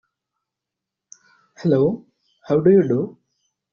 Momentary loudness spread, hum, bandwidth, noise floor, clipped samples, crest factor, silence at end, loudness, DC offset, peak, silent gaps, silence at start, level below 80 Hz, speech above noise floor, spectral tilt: 13 LU; none; 7 kHz; -85 dBFS; under 0.1%; 18 dB; 0.6 s; -19 LUFS; under 0.1%; -4 dBFS; none; 1.6 s; -62 dBFS; 68 dB; -9.5 dB/octave